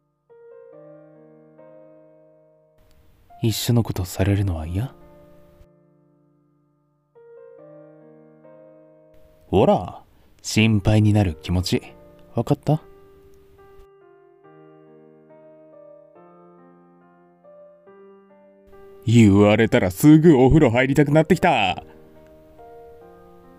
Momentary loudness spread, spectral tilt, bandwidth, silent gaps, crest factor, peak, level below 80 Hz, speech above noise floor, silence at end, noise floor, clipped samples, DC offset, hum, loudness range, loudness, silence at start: 15 LU; -6.5 dB/octave; 16 kHz; none; 20 dB; -2 dBFS; -42 dBFS; 48 dB; 1.8 s; -65 dBFS; under 0.1%; under 0.1%; none; 14 LU; -18 LUFS; 3.4 s